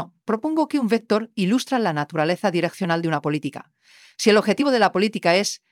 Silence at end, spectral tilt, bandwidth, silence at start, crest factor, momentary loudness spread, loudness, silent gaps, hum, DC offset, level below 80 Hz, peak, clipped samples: 0.15 s; -5 dB/octave; 16 kHz; 0 s; 18 dB; 8 LU; -21 LUFS; none; none; under 0.1%; -72 dBFS; -4 dBFS; under 0.1%